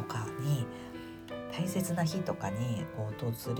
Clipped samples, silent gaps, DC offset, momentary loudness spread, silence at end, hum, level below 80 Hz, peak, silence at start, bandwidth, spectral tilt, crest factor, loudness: under 0.1%; none; under 0.1%; 11 LU; 0 s; none; -62 dBFS; -20 dBFS; 0 s; 19 kHz; -6 dB/octave; 14 dB; -35 LUFS